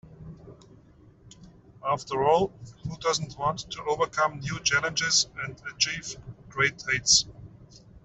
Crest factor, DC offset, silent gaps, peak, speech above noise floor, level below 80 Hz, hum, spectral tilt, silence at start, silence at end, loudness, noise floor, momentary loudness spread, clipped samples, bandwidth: 20 dB; under 0.1%; none; -8 dBFS; 28 dB; -56 dBFS; none; -1.5 dB/octave; 0.05 s; 0.05 s; -26 LUFS; -55 dBFS; 18 LU; under 0.1%; 8.2 kHz